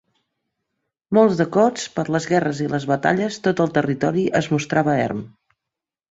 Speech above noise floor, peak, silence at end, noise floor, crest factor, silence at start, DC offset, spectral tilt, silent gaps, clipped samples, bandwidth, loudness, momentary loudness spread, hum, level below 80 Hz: 66 dB; -2 dBFS; 0.85 s; -85 dBFS; 18 dB; 1.1 s; under 0.1%; -6 dB/octave; none; under 0.1%; 8 kHz; -20 LUFS; 6 LU; none; -58 dBFS